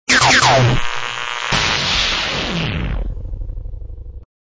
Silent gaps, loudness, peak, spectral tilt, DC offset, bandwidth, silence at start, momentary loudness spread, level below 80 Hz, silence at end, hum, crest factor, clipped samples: none; -15 LUFS; -2 dBFS; -3 dB/octave; under 0.1%; 8 kHz; 0.1 s; 22 LU; -28 dBFS; 0.35 s; none; 16 dB; under 0.1%